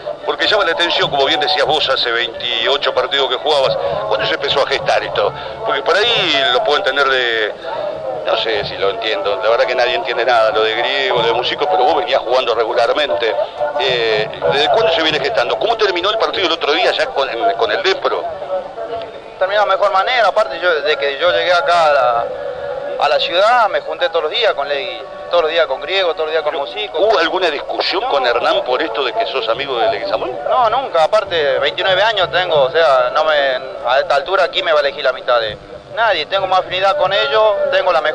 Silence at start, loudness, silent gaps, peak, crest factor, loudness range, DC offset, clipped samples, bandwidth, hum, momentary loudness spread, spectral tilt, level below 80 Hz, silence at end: 0 s; -15 LUFS; none; -2 dBFS; 12 dB; 2 LU; under 0.1%; under 0.1%; 10 kHz; none; 7 LU; -3 dB/octave; -50 dBFS; 0 s